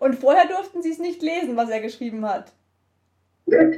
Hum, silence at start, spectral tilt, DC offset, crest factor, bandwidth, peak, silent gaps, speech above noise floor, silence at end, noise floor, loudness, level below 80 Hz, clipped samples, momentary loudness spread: none; 0 s; -5.5 dB/octave; under 0.1%; 18 dB; 11.5 kHz; -4 dBFS; none; 47 dB; 0 s; -68 dBFS; -22 LUFS; -68 dBFS; under 0.1%; 12 LU